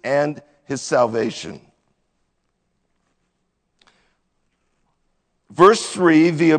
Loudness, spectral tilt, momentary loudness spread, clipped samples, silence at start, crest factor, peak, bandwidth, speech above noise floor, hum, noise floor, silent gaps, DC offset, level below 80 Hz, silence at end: -17 LUFS; -5.5 dB/octave; 21 LU; under 0.1%; 0.05 s; 20 dB; 0 dBFS; 9.4 kHz; 55 dB; none; -71 dBFS; none; under 0.1%; -64 dBFS; 0 s